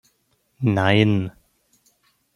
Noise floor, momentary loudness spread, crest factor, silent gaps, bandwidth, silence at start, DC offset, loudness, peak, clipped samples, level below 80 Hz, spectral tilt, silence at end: -67 dBFS; 9 LU; 20 dB; none; 11 kHz; 0.6 s; under 0.1%; -20 LUFS; -2 dBFS; under 0.1%; -58 dBFS; -7.5 dB/octave; 1.05 s